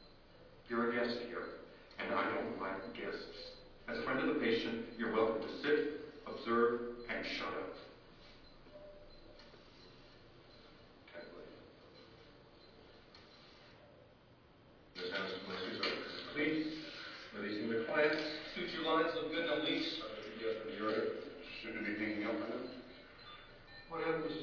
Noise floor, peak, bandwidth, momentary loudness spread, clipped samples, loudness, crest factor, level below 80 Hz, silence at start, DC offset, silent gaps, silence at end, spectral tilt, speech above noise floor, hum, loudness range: -64 dBFS; -20 dBFS; 5.4 kHz; 24 LU; under 0.1%; -39 LUFS; 20 dB; -66 dBFS; 0 s; under 0.1%; none; 0 s; -2 dB/octave; 26 dB; none; 20 LU